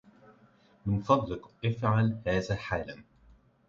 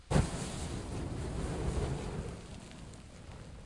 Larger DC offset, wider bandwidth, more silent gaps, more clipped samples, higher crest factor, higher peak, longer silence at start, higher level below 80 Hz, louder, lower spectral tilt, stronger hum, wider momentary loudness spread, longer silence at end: neither; second, 7.2 kHz vs 11.5 kHz; neither; neither; about the same, 22 dB vs 22 dB; first, -10 dBFS vs -14 dBFS; first, 0.85 s vs 0 s; second, -52 dBFS vs -44 dBFS; first, -30 LUFS vs -38 LUFS; first, -7.5 dB/octave vs -6 dB/octave; neither; about the same, 13 LU vs 15 LU; first, 0.65 s vs 0 s